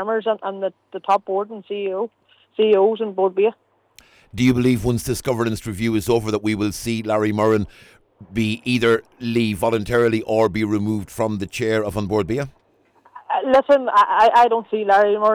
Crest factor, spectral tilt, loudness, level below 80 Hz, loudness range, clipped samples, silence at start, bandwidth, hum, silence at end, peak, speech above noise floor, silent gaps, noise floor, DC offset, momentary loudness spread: 12 dB; -6 dB/octave; -20 LUFS; -48 dBFS; 4 LU; under 0.1%; 0 s; 19.5 kHz; none; 0 s; -6 dBFS; 38 dB; none; -56 dBFS; under 0.1%; 11 LU